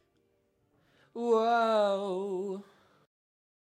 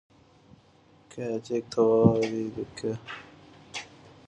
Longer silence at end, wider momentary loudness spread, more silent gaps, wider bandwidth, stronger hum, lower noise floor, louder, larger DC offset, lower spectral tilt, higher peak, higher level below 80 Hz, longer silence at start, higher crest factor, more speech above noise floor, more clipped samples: first, 1 s vs 0.45 s; second, 15 LU vs 21 LU; neither; about the same, 10 kHz vs 9.8 kHz; neither; first, -73 dBFS vs -59 dBFS; about the same, -29 LUFS vs -27 LUFS; neither; second, -5.5 dB/octave vs -7 dB/octave; second, -16 dBFS vs -6 dBFS; second, -90 dBFS vs -58 dBFS; about the same, 1.15 s vs 1.15 s; second, 16 dB vs 22 dB; first, 45 dB vs 33 dB; neither